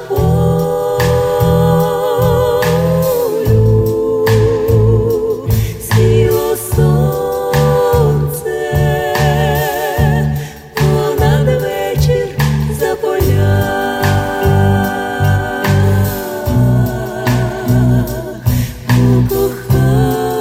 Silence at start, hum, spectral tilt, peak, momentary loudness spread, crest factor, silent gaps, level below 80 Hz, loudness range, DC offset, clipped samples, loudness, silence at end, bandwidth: 0 s; none; -6.5 dB/octave; 0 dBFS; 5 LU; 12 dB; none; -26 dBFS; 2 LU; under 0.1%; under 0.1%; -13 LUFS; 0 s; 16.5 kHz